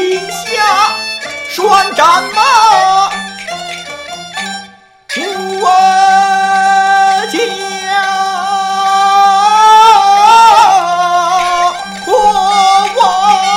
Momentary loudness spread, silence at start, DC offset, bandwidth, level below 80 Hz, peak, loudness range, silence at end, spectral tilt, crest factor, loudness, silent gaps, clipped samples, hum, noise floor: 15 LU; 0 s; under 0.1%; 16 kHz; -48 dBFS; 0 dBFS; 6 LU; 0 s; -1.5 dB/octave; 10 dB; -9 LUFS; none; 0.3%; none; -35 dBFS